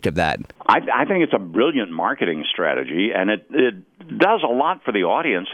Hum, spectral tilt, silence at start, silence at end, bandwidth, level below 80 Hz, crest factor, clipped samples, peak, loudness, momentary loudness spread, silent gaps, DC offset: none; -6 dB/octave; 0 s; 0 s; 12 kHz; -52 dBFS; 20 dB; under 0.1%; 0 dBFS; -20 LUFS; 4 LU; none; under 0.1%